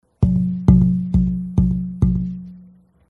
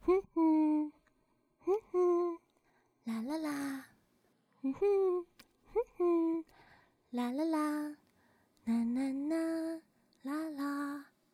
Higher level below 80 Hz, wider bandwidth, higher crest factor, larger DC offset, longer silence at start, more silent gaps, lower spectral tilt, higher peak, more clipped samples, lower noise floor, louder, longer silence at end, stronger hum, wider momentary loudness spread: first, -26 dBFS vs -70 dBFS; second, 2.2 kHz vs 14.5 kHz; about the same, 18 dB vs 16 dB; neither; first, 0.2 s vs 0.05 s; neither; first, -11.5 dB/octave vs -6 dB/octave; first, 0 dBFS vs -20 dBFS; neither; second, -48 dBFS vs -75 dBFS; first, -18 LUFS vs -35 LUFS; first, 0.5 s vs 0.3 s; neither; second, 9 LU vs 13 LU